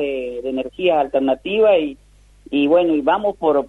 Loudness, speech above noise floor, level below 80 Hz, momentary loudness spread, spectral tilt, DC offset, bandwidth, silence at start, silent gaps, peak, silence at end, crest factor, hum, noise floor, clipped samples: -18 LUFS; 29 dB; -50 dBFS; 10 LU; -7 dB/octave; under 0.1%; 4.2 kHz; 0 s; none; -4 dBFS; 0 s; 14 dB; none; -46 dBFS; under 0.1%